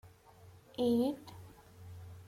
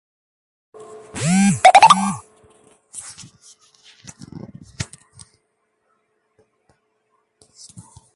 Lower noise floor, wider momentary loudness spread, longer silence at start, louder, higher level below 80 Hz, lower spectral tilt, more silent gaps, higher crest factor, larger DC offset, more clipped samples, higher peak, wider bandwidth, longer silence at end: second, -59 dBFS vs -69 dBFS; second, 24 LU vs 30 LU; second, 0.05 s vs 1.15 s; second, -34 LUFS vs -13 LUFS; second, -68 dBFS vs -56 dBFS; first, -7 dB/octave vs -4 dB/octave; neither; second, 16 dB vs 22 dB; neither; neither; second, -22 dBFS vs 0 dBFS; first, 16 kHz vs 11.5 kHz; second, 0.05 s vs 3.3 s